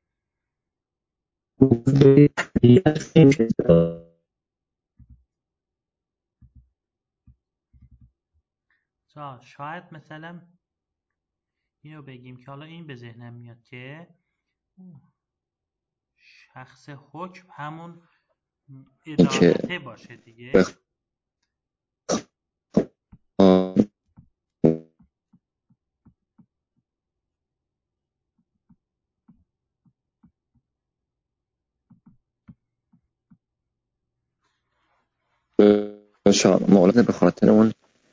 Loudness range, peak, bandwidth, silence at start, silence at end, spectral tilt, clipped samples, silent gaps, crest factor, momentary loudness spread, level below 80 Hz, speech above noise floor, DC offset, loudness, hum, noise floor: 25 LU; -2 dBFS; 7.8 kHz; 1.6 s; 0.4 s; -7 dB/octave; under 0.1%; none; 22 dB; 26 LU; -54 dBFS; 66 dB; under 0.1%; -19 LUFS; none; -87 dBFS